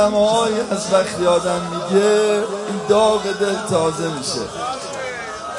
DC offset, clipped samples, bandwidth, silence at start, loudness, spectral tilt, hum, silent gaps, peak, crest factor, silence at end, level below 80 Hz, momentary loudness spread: under 0.1%; under 0.1%; 11.5 kHz; 0 s; -19 LUFS; -4 dB/octave; none; none; -2 dBFS; 16 dB; 0 s; -52 dBFS; 10 LU